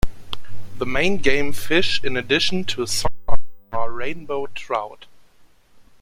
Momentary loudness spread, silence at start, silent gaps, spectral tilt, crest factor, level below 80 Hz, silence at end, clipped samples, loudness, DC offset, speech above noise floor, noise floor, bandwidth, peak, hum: 16 LU; 0.05 s; none; -3.5 dB/octave; 16 dB; -36 dBFS; 1.15 s; under 0.1%; -23 LUFS; under 0.1%; 32 dB; -50 dBFS; 16.5 kHz; 0 dBFS; none